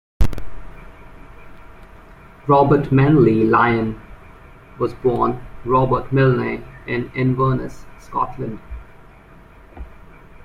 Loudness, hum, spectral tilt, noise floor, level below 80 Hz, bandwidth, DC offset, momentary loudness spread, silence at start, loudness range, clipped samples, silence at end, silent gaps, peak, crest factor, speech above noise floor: -18 LUFS; none; -9 dB/octave; -44 dBFS; -34 dBFS; 7.4 kHz; under 0.1%; 22 LU; 0.2 s; 7 LU; under 0.1%; 0.55 s; none; -2 dBFS; 18 dB; 27 dB